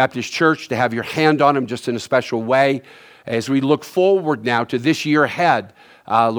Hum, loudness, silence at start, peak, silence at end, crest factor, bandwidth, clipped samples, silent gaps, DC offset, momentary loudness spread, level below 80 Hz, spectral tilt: none; -18 LUFS; 0 s; 0 dBFS; 0 s; 18 dB; over 20 kHz; under 0.1%; none; under 0.1%; 6 LU; -66 dBFS; -5.5 dB/octave